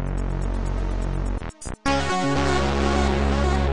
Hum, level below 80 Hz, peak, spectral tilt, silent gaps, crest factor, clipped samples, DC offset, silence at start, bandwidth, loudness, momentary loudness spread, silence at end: none; -26 dBFS; -8 dBFS; -5.5 dB/octave; none; 14 dB; under 0.1%; under 0.1%; 0 s; 10.5 kHz; -24 LUFS; 7 LU; 0 s